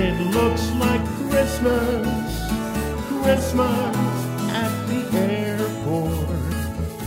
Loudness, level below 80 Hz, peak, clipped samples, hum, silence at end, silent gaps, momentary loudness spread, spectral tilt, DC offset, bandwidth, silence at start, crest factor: -22 LUFS; -34 dBFS; -4 dBFS; under 0.1%; none; 0 s; none; 6 LU; -6 dB/octave; under 0.1%; 16 kHz; 0 s; 16 dB